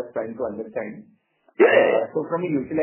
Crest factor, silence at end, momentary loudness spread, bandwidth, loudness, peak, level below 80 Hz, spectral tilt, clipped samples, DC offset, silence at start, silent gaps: 18 dB; 0 s; 15 LU; 3.2 kHz; -22 LUFS; -4 dBFS; -64 dBFS; -9.5 dB/octave; under 0.1%; under 0.1%; 0 s; none